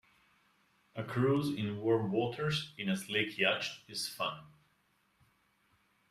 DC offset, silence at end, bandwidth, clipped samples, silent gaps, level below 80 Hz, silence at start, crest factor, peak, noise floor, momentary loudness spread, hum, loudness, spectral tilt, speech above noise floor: under 0.1%; 1.6 s; 15.5 kHz; under 0.1%; none; -72 dBFS; 0.95 s; 22 dB; -16 dBFS; -74 dBFS; 8 LU; none; -34 LUFS; -5 dB/octave; 40 dB